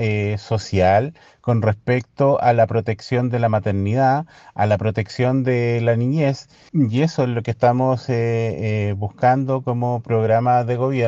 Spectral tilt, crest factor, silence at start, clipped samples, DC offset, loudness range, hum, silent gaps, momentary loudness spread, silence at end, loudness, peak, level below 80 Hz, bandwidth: -8 dB/octave; 16 dB; 0 s; under 0.1%; under 0.1%; 1 LU; none; none; 6 LU; 0 s; -19 LUFS; -4 dBFS; -56 dBFS; 7.6 kHz